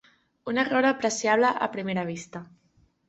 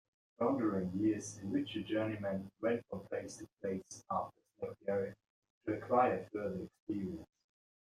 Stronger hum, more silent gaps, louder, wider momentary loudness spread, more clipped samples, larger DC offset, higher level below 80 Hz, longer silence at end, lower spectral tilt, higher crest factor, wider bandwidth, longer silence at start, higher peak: neither; second, none vs 5.30-5.42 s, 5.50-5.61 s, 6.80-6.87 s; first, -25 LUFS vs -38 LUFS; first, 18 LU vs 11 LU; neither; neither; first, -68 dBFS vs -74 dBFS; about the same, 0.65 s vs 0.55 s; second, -4 dB/octave vs -6 dB/octave; about the same, 18 dB vs 20 dB; second, 8.2 kHz vs 12.5 kHz; about the same, 0.45 s vs 0.4 s; first, -8 dBFS vs -18 dBFS